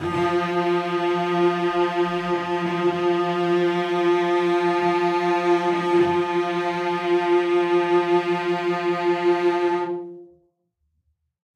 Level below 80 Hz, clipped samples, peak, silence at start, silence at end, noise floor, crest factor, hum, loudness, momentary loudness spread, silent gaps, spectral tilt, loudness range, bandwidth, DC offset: -66 dBFS; under 0.1%; -8 dBFS; 0 s; 1.3 s; -72 dBFS; 14 dB; none; -21 LUFS; 4 LU; none; -6.5 dB/octave; 2 LU; 8.6 kHz; under 0.1%